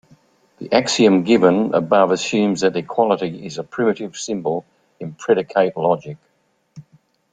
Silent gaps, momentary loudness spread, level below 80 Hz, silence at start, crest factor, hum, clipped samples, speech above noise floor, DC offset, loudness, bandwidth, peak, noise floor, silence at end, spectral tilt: none; 14 LU; -62 dBFS; 0.6 s; 18 dB; none; under 0.1%; 39 dB; under 0.1%; -18 LUFS; 9.4 kHz; -2 dBFS; -57 dBFS; 0.5 s; -5 dB/octave